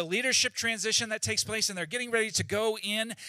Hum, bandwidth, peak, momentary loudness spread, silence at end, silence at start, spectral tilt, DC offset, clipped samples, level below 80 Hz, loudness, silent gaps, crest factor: none; 16 kHz; -12 dBFS; 5 LU; 0 s; 0 s; -1.5 dB/octave; under 0.1%; under 0.1%; -66 dBFS; -28 LUFS; none; 18 dB